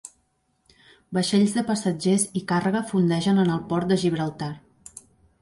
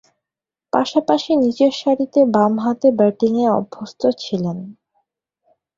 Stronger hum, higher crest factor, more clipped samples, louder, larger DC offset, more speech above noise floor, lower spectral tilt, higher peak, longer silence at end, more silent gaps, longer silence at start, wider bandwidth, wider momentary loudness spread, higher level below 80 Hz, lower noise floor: neither; about the same, 14 dB vs 18 dB; neither; second, -23 LUFS vs -17 LUFS; neither; second, 47 dB vs 71 dB; about the same, -5.5 dB/octave vs -6.5 dB/octave; second, -10 dBFS vs 0 dBFS; second, 0.85 s vs 1.05 s; neither; second, 0.05 s vs 0.75 s; first, 11.5 kHz vs 7.6 kHz; first, 13 LU vs 8 LU; about the same, -60 dBFS vs -62 dBFS; second, -69 dBFS vs -87 dBFS